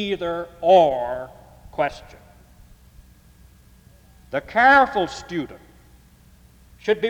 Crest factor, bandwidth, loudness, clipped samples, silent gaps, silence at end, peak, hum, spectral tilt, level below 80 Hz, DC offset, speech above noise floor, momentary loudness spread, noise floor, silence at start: 18 dB; 19 kHz; -20 LUFS; under 0.1%; none; 0 s; -4 dBFS; none; -5 dB/octave; -50 dBFS; under 0.1%; 31 dB; 20 LU; -51 dBFS; 0 s